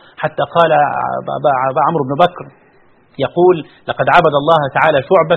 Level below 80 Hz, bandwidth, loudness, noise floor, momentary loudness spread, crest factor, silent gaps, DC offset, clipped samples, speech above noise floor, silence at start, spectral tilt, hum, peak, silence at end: -50 dBFS; 7 kHz; -14 LUFS; -49 dBFS; 9 LU; 14 dB; none; under 0.1%; 0.1%; 36 dB; 0.2 s; -7.5 dB/octave; none; 0 dBFS; 0 s